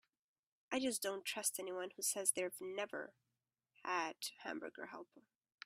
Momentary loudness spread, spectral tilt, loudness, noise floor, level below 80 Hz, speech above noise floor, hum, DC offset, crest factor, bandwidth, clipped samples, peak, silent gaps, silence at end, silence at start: 15 LU; -1 dB/octave; -41 LUFS; -84 dBFS; -86 dBFS; 41 dB; none; under 0.1%; 26 dB; 16 kHz; under 0.1%; -20 dBFS; none; 0.45 s; 0.7 s